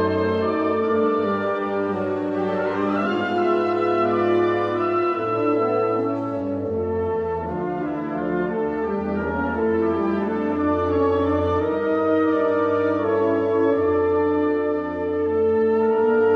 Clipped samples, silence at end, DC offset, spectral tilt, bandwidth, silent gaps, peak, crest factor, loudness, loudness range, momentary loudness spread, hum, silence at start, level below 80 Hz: under 0.1%; 0 s; under 0.1%; -8.5 dB/octave; 6 kHz; none; -10 dBFS; 12 dB; -22 LUFS; 4 LU; 5 LU; none; 0 s; -50 dBFS